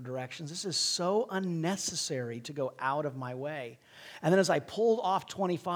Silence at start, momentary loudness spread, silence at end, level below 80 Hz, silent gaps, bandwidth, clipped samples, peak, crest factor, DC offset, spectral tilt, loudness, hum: 0 s; 12 LU; 0 s; -76 dBFS; none; over 20 kHz; under 0.1%; -14 dBFS; 18 dB; under 0.1%; -4 dB/octave; -32 LUFS; none